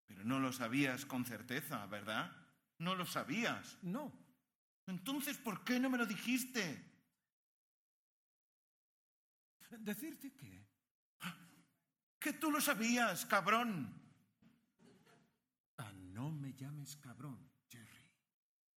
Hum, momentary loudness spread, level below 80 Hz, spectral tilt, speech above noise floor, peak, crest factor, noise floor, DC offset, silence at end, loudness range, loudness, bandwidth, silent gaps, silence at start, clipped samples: none; 19 LU; -86 dBFS; -4 dB/octave; 34 dB; -18 dBFS; 26 dB; -74 dBFS; under 0.1%; 0.75 s; 15 LU; -40 LUFS; 18 kHz; 4.55-4.87 s, 7.32-9.60 s, 10.91-11.20 s, 12.03-12.21 s, 15.60-15.78 s; 0.1 s; under 0.1%